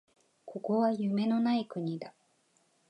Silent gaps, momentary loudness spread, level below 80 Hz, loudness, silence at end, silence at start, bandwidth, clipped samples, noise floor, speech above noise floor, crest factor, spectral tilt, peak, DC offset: none; 14 LU; -84 dBFS; -31 LUFS; 0.8 s; 0.45 s; 9.2 kHz; under 0.1%; -71 dBFS; 41 dB; 16 dB; -8 dB/octave; -18 dBFS; under 0.1%